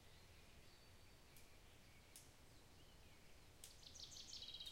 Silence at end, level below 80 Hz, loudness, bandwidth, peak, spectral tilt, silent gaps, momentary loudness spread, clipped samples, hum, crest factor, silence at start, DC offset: 0 s; -72 dBFS; -61 LUFS; 16 kHz; -40 dBFS; -2 dB/octave; none; 13 LU; under 0.1%; none; 22 dB; 0 s; under 0.1%